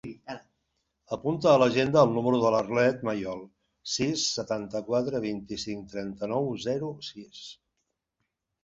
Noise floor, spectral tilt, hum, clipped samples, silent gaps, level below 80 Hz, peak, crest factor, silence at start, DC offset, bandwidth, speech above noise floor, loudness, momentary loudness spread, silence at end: -82 dBFS; -5 dB/octave; none; under 0.1%; none; -62 dBFS; -6 dBFS; 22 dB; 0.05 s; under 0.1%; 8 kHz; 55 dB; -27 LUFS; 20 LU; 1.1 s